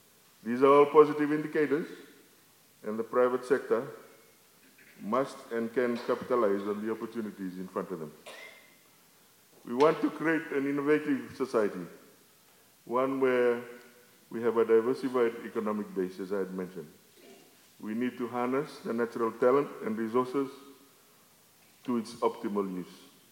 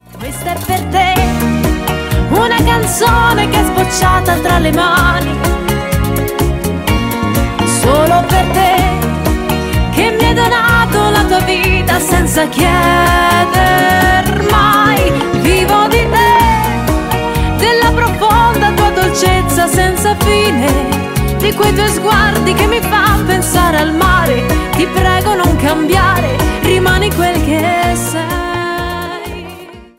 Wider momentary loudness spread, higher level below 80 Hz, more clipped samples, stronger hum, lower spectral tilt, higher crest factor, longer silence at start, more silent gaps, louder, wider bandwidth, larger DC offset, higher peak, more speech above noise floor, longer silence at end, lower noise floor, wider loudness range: first, 17 LU vs 6 LU; second, -84 dBFS vs -20 dBFS; neither; neither; first, -6.5 dB/octave vs -4.5 dB/octave; first, 24 dB vs 10 dB; first, 0.45 s vs 0.15 s; neither; second, -30 LUFS vs -11 LUFS; about the same, 17 kHz vs 16.5 kHz; neither; second, -8 dBFS vs 0 dBFS; first, 32 dB vs 21 dB; first, 0.35 s vs 0.15 s; first, -61 dBFS vs -32 dBFS; about the same, 5 LU vs 3 LU